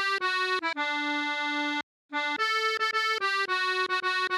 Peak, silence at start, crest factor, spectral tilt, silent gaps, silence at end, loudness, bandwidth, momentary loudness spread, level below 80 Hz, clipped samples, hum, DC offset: -16 dBFS; 0 s; 14 dB; 0 dB/octave; 1.83-2.09 s; 0 s; -27 LUFS; 16 kHz; 4 LU; -88 dBFS; under 0.1%; none; under 0.1%